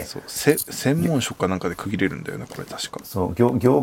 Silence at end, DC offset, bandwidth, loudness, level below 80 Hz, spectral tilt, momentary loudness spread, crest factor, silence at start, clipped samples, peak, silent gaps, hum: 0 s; under 0.1%; 17 kHz; -23 LUFS; -54 dBFS; -5.5 dB/octave; 12 LU; 20 dB; 0 s; under 0.1%; -2 dBFS; none; none